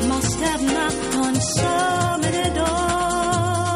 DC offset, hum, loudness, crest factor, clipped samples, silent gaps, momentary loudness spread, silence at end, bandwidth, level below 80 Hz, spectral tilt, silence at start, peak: under 0.1%; none; -20 LUFS; 14 dB; under 0.1%; none; 1 LU; 0 s; 15.5 kHz; -36 dBFS; -4 dB/octave; 0 s; -8 dBFS